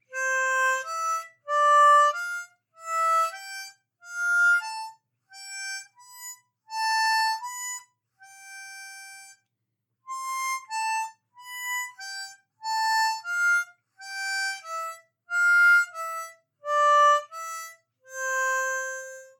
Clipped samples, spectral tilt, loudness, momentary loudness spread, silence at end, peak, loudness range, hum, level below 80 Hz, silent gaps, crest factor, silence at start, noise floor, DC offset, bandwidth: under 0.1%; 4.5 dB/octave; -24 LUFS; 22 LU; 0.15 s; -10 dBFS; 10 LU; none; under -90 dBFS; none; 16 dB; 0.1 s; -81 dBFS; under 0.1%; 19 kHz